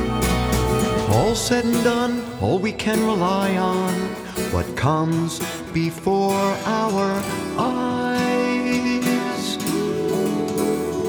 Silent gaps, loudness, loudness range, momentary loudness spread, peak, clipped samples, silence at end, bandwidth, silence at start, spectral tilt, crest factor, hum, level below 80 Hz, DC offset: none; -21 LUFS; 2 LU; 5 LU; -4 dBFS; under 0.1%; 0 s; over 20 kHz; 0 s; -5 dB/octave; 16 dB; none; -38 dBFS; under 0.1%